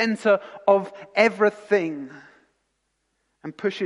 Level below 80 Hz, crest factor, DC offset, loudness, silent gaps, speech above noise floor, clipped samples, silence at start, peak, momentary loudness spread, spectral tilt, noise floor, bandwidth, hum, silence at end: -76 dBFS; 20 dB; under 0.1%; -22 LUFS; none; 52 dB; under 0.1%; 0 s; -4 dBFS; 19 LU; -5.5 dB/octave; -74 dBFS; 11 kHz; none; 0 s